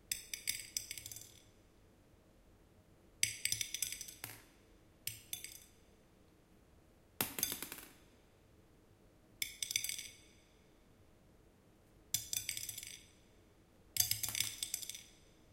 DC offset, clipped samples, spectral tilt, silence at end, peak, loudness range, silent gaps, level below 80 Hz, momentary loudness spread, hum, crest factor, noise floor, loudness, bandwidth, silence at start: under 0.1%; under 0.1%; 0 dB/octave; 0.05 s; -12 dBFS; 5 LU; none; -70 dBFS; 17 LU; none; 34 dB; -67 dBFS; -40 LUFS; 16.5 kHz; 0.05 s